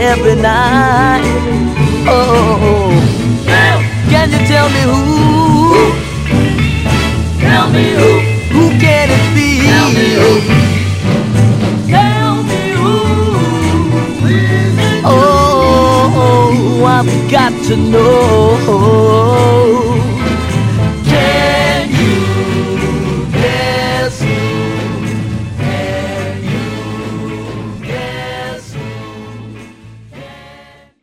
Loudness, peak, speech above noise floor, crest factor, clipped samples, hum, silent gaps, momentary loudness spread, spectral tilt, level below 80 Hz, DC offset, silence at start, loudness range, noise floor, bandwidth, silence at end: -10 LUFS; 0 dBFS; 32 dB; 10 dB; 0.2%; none; none; 11 LU; -6 dB/octave; -26 dBFS; under 0.1%; 0 s; 10 LU; -40 dBFS; 15 kHz; 0.6 s